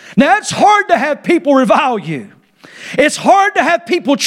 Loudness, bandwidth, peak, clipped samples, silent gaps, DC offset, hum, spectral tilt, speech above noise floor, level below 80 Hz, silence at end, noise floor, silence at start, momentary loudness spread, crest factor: -12 LUFS; 15.5 kHz; 0 dBFS; under 0.1%; none; under 0.1%; none; -4 dB/octave; 25 dB; -56 dBFS; 0 s; -36 dBFS; 0.05 s; 11 LU; 12 dB